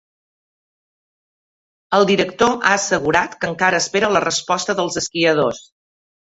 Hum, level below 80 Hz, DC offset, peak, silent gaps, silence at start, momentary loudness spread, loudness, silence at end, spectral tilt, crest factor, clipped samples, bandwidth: none; -54 dBFS; under 0.1%; 0 dBFS; none; 1.9 s; 5 LU; -17 LUFS; 0.7 s; -3 dB/octave; 18 dB; under 0.1%; 8.2 kHz